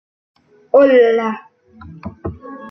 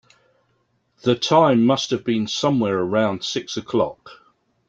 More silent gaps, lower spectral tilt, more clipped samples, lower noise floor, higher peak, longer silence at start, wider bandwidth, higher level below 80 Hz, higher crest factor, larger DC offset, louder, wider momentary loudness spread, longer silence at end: neither; first, -7.5 dB/octave vs -5.5 dB/octave; neither; second, -40 dBFS vs -67 dBFS; about the same, -2 dBFS vs -2 dBFS; second, 0.75 s vs 1.05 s; second, 6 kHz vs 7.8 kHz; first, -50 dBFS vs -62 dBFS; about the same, 16 dB vs 18 dB; neither; first, -13 LUFS vs -20 LUFS; first, 23 LU vs 10 LU; second, 0 s vs 0.55 s